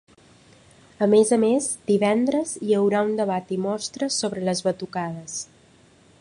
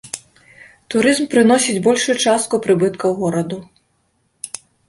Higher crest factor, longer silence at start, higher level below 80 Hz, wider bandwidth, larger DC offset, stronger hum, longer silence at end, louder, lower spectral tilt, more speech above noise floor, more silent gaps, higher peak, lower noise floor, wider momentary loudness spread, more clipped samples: about the same, 18 dB vs 16 dB; first, 1 s vs 0.05 s; second, -66 dBFS vs -58 dBFS; about the same, 11.5 kHz vs 11.5 kHz; neither; neither; first, 0.75 s vs 0.4 s; second, -23 LUFS vs -16 LUFS; about the same, -4.5 dB/octave vs -4 dB/octave; second, 33 dB vs 48 dB; neither; second, -6 dBFS vs -2 dBFS; second, -55 dBFS vs -64 dBFS; second, 11 LU vs 17 LU; neither